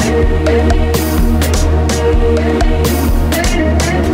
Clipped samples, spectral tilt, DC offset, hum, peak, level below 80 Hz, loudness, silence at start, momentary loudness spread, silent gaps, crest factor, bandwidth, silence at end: under 0.1%; -5.5 dB/octave; under 0.1%; none; 0 dBFS; -14 dBFS; -13 LUFS; 0 s; 1 LU; none; 10 dB; 16.5 kHz; 0 s